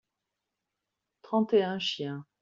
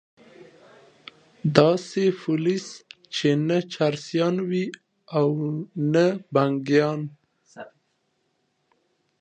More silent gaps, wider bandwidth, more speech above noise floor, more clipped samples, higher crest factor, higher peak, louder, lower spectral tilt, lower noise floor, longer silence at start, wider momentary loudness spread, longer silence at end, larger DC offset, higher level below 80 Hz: neither; second, 7.6 kHz vs 9.2 kHz; first, 57 dB vs 49 dB; neither; second, 18 dB vs 24 dB; second, -14 dBFS vs 0 dBFS; second, -29 LUFS vs -23 LUFS; second, -3.5 dB/octave vs -6.5 dB/octave; first, -86 dBFS vs -72 dBFS; first, 1.25 s vs 0.4 s; about the same, 10 LU vs 12 LU; second, 0.2 s vs 1.55 s; neither; second, -76 dBFS vs -68 dBFS